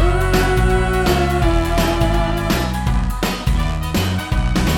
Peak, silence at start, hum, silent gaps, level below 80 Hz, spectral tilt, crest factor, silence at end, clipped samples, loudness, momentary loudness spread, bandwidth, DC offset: -2 dBFS; 0 s; none; none; -20 dBFS; -5.5 dB/octave; 14 dB; 0 s; under 0.1%; -18 LUFS; 4 LU; 17.5 kHz; under 0.1%